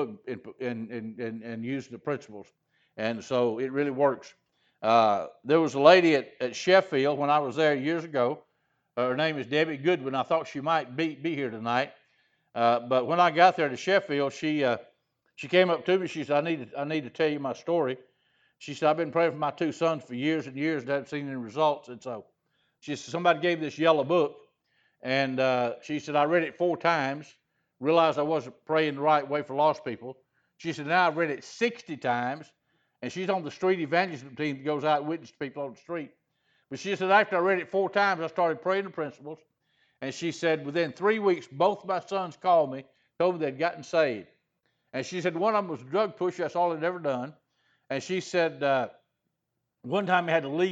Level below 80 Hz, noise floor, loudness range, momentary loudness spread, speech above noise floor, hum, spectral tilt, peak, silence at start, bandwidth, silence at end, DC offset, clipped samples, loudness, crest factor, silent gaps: -80 dBFS; -82 dBFS; 6 LU; 14 LU; 55 dB; none; -5.5 dB/octave; -4 dBFS; 0 s; 8 kHz; 0 s; under 0.1%; under 0.1%; -27 LUFS; 24 dB; none